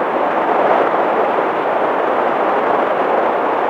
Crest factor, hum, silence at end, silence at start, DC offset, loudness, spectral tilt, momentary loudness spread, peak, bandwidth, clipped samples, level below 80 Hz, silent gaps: 14 dB; none; 0 s; 0 s; under 0.1%; -15 LUFS; -6 dB/octave; 3 LU; -2 dBFS; 9.8 kHz; under 0.1%; -60 dBFS; none